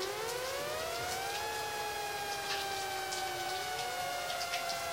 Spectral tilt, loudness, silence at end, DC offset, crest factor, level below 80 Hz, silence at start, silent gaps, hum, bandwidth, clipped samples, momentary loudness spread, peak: -1 dB/octave; -36 LUFS; 0 s; under 0.1%; 14 dB; -64 dBFS; 0 s; none; none; 16 kHz; under 0.1%; 2 LU; -22 dBFS